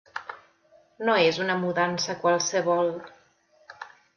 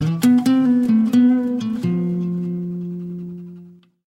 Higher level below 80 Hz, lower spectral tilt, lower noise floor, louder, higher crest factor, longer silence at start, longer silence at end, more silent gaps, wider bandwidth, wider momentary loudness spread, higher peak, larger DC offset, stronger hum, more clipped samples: second, -72 dBFS vs -60 dBFS; second, -3.5 dB/octave vs -7.5 dB/octave; first, -62 dBFS vs -44 dBFS; second, -24 LUFS vs -18 LUFS; first, 18 dB vs 12 dB; first, 0.15 s vs 0 s; about the same, 0.3 s vs 0.35 s; neither; second, 7.2 kHz vs 14.5 kHz; first, 21 LU vs 16 LU; second, -10 dBFS vs -6 dBFS; neither; neither; neither